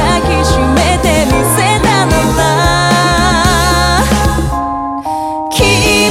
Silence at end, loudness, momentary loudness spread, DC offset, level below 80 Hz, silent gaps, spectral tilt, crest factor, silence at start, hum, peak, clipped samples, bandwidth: 0 s; -10 LUFS; 7 LU; under 0.1%; -20 dBFS; none; -4 dB/octave; 10 dB; 0 s; none; 0 dBFS; under 0.1%; 17 kHz